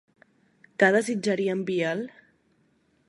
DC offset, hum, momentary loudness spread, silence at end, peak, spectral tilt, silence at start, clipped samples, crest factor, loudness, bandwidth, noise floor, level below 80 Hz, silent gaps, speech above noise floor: under 0.1%; none; 15 LU; 1 s; -6 dBFS; -5 dB/octave; 0.8 s; under 0.1%; 22 dB; -25 LUFS; 11.5 kHz; -67 dBFS; -76 dBFS; none; 42 dB